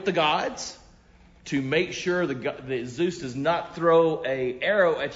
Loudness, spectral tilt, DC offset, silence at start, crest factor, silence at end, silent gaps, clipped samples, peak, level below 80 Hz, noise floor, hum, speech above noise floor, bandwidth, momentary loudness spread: -25 LUFS; -5 dB/octave; under 0.1%; 0 s; 16 dB; 0 s; none; under 0.1%; -8 dBFS; -58 dBFS; -54 dBFS; none; 29 dB; 7.8 kHz; 11 LU